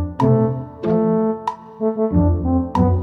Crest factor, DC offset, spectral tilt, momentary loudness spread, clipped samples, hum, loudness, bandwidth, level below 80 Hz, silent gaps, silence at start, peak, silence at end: 14 dB; under 0.1%; -10.5 dB/octave; 8 LU; under 0.1%; none; -19 LUFS; 6.2 kHz; -32 dBFS; none; 0 s; -4 dBFS; 0 s